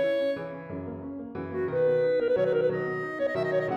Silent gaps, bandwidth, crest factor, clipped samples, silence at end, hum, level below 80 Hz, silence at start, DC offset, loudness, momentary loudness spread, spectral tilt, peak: none; 6 kHz; 12 dB; under 0.1%; 0 s; none; -64 dBFS; 0 s; under 0.1%; -28 LUFS; 13 LU; -8 dB/octave; -16 dBFS